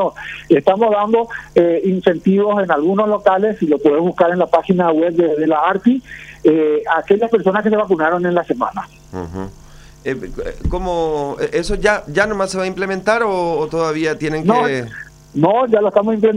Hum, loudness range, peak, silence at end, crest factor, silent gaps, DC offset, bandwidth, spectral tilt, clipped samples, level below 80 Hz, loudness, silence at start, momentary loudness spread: none; 6 LU; 0 dBFS; 0 s; 16 dB; none; under 0.1%; 11 kHz; -6.5 dB/octave; under 0.1%; -36 dBFS; -16 LUFS; 0 s; 11 LU